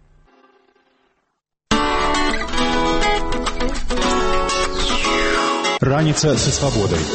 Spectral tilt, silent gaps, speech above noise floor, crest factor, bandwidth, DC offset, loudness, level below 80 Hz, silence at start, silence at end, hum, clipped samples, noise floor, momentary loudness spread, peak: -4 dB/octave; none; 55 dB; 18 dB; 8.8 kHz; under 0.1%; -18 LUFS; -26 dBFS; 1.7 s; 0 s; none; under 0.1%; -72 dBFS; 5 LU; -2 dBFS